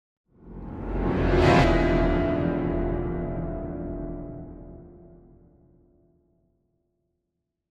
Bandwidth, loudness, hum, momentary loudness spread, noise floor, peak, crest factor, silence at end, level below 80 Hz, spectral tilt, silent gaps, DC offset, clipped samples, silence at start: 9 kHz; -25 LUFS; none; 23 LU; -82 dBFS; -6 dBFS; 20 dB; 2.55 s; -34 dBFS; -7.5 dB/octave; none; under 0.1%; under 0.1%; 0.45 s